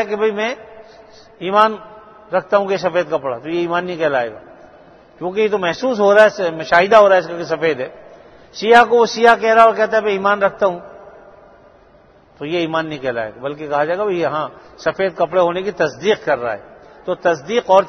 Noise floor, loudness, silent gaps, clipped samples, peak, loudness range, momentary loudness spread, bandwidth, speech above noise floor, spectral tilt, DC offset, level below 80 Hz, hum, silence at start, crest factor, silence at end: -48 dBFS; -16 LUFS; none; under 0.1%; 0 dBFS; 8 LU; 15 LU; 10.5 kHz; 33 dB; -5 dB/octave; under 0.1%; -56 dBFS; none; 0 s; 16 dB; 0 s